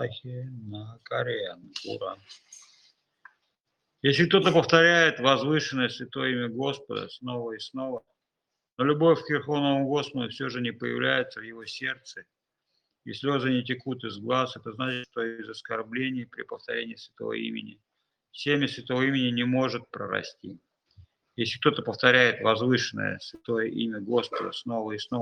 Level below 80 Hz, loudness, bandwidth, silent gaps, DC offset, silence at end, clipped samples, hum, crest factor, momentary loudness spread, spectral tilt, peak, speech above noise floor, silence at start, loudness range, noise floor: -72 dBFS; -27 LUFS; 9.4 kHz; 8.73-8.77 s; under 0.1%; 0 s; under 0.1%; none; 26 dB; 18 LU; -5 dB/octave; -2 dBFS; 58 dB; 0 s; 10 LU; -85 dBFS